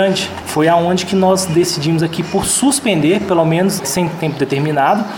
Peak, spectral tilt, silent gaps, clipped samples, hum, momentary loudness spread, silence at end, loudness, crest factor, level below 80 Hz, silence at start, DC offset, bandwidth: 0 dBFS; -4.5 dB/octave; none; under 0.1%; none; 5 LU; 0 s; -14 LUFS; 14 dB; -48 dBFS; 0 s; under 0.1%; 18 kHz